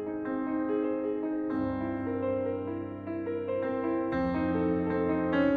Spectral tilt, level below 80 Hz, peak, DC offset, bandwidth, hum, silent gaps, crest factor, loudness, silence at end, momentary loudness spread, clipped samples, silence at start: -10 dB/octave; -56 dBFS; -16 dBFS; under 0.1%; 4.9 kHz; none; none; 14 dB; -31 LUFS; 0 s; 6 LU; under 0.1%; 0 s